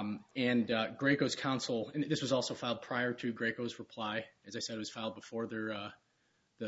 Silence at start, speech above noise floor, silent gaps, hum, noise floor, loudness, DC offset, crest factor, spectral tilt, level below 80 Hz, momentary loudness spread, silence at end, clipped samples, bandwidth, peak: 0 s; 40 dB; none; none; -76 dBFS; -36 LUFS; under 0.1%; 20 dB; -3.5 dB/octave; -76 dBFS; 10 LU; 0 s; under 0.1%; 7.6 kHz; -16 dBFS